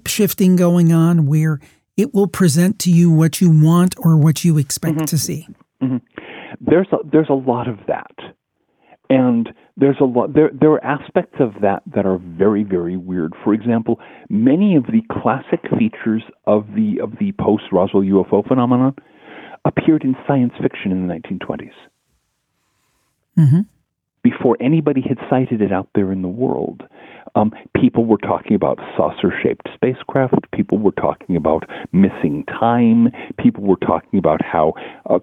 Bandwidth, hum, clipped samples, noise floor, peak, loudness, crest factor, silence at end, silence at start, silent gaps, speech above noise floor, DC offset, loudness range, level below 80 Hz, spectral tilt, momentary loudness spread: 17.5 kHz; none; under 0.1%; -69 dBFS; -2 dBFS; -17 LUFS; 14 dB; 0 s; 0.05 s; none; 53 dB; under 0.1%; 6 LU; -52 dBFS; -7 dB/octave; 9 LU